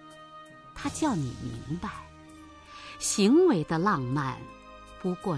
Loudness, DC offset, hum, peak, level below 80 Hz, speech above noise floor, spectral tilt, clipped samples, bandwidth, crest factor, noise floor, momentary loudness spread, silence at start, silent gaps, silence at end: -28 LUFS; under 0.1%; none; -12 dBFS; -54 dBFS; 23 dB; -5 dB/octave; under 0.1%; 11 kHz; 18 dB; -49 dBFS; 26 LU; 0 s; none; 0 s